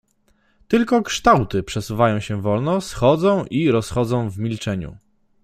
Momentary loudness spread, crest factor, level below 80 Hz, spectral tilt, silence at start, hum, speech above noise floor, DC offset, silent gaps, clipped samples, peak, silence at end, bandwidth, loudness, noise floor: 10 LU; 18 dB; -44 dBFS; -6 dB/octave; 0.7 s; none; 43 dB; under 0.1%; none; under 0.1%; -2 dBFS; 0.5 s; 15.5 kHz; -20 LUFS; -62 dBFS